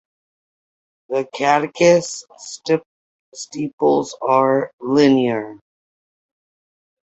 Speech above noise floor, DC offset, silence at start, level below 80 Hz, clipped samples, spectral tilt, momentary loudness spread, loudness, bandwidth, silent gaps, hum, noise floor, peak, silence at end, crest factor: over 72 dB; under 0.1%; 1.1 s; -64 dBFS; under 0.1%; -5 dB/octave; 17 LU; -18 LUFS; 8.2 kHz; 2.86-3.32 s, 3.73-3.78 s, 4.73-4.78 s; none; under -90 dBFS; -2 dBFS; 1.55 s; 18 dB